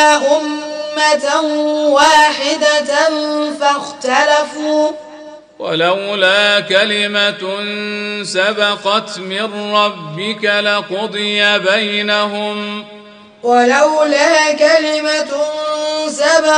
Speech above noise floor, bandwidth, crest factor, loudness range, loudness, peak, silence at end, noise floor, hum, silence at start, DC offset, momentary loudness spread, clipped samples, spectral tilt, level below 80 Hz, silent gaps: 21 dB; 10.5 kHz; 14 dB; 3 LU; -13 LUFS; 0 dBFS; 0 s; -35 dBFS; none; 0 s; under 0.1%; 10 LU; under 0.1%; -2.5 dB/octave; -62 dBFS; none